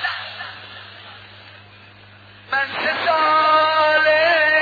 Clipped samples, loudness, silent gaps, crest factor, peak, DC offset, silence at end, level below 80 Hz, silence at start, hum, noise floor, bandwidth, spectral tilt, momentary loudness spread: under 0.1%; -16 LUFS; none; 14 dB; -6 dBFS; under 0.1%; 0 s; -68 dBFS; 0 s; none; -45 dBFS; 5 kHz; -4 dB/octave; 22 LU